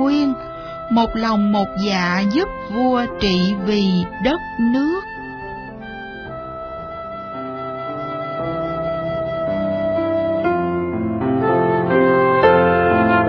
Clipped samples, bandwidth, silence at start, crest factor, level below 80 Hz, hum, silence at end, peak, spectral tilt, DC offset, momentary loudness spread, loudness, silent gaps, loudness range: under 0.1%; 5.4 kHz; 0 s; 18 dB; -42 dBFS; none; 0 s; 0 dBFS; -7 dB/octave; under 0.1%; 16 LU; -19 LUFS; none; 10 LU